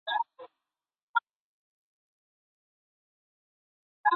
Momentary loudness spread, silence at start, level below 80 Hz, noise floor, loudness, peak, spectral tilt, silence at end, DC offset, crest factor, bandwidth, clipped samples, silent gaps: 21 LU; 0.05 s; under -90 dBFS; -89 dBFS; -33 LUFS; -12 dBFS; 4.5 dB/octave; 0 s; under 0.1%; 24 dB; 4.4 kHz; under 0.1%; 1.03-1.14 s, 1.36-4.04 s